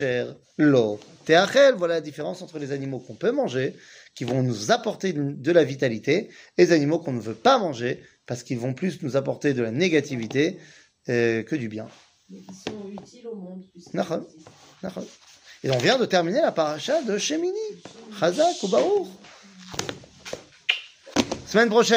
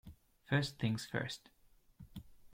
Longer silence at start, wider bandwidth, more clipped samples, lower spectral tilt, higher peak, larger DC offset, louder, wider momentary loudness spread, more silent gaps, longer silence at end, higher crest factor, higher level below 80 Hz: about the same, 0 s vs 0.05 s; about the same, 16 kHz vs 16.5 kHz; neither; about the same, -5 dB/octave vs -5.5 dB/octave; first, -4 dBFS vs -18 dBFS; neither; first, -24 LUFS vs -38 LUFS; about the same, 19 LU vs 19 LU; neither; about the same, 0 s vs 0.05 s; about the same, 20 dB vs 22 dB; about the same, -64 dBFS vs -64 dBFS